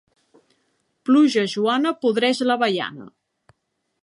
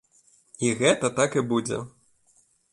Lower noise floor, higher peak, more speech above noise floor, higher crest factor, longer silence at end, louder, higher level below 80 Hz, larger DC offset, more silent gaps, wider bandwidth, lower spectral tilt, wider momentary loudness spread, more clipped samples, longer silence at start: first, -73 dBFS vs -64 dBFS; about the same, -6 dBFS vs -8 dBFS; first, 54 dB vs 40 dB; about the same, 16 dB vs 20 dB; about the same, 0.95 s vs 0.85 s; first, -20 LUFS vs -24 LUFS; second, -76 dBFS vs -64 dBFS; neither; neither; about the same, 11 kHz vs 11.5 kHz; about the same, -4.5 dB/octave vs -4 dB/octave; first, 14 LU vs 11 LU; neither; first, 1.05 s vs 0.6 s